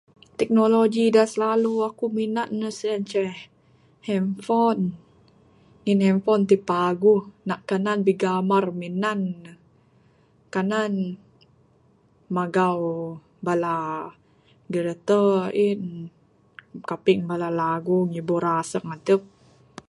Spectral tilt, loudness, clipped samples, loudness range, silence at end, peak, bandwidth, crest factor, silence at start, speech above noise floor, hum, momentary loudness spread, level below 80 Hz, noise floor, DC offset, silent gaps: -6.5 dB/octave; -23 LUFS; under 0.1%; 5 LU; 0.65 s; -4 dBFS; 11.5 kHz; 18 dB; 0.4 s; 37 dB; none; 13 LU; -68 dBFS; -60 dBFS; under 0.1%; none